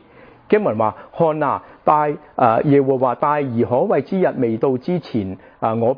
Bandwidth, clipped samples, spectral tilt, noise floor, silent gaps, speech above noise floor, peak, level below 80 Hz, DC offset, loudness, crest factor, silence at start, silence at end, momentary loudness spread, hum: 5.2 kHz; under 0.1%; -10.5 dB/octave; -46 dBFS; none; 28 dB; 0 dBFS; -58 dBFS; under 0.1%; -18 LUFS; 18 dB; 0.5 s; 0 s; 7 LU; none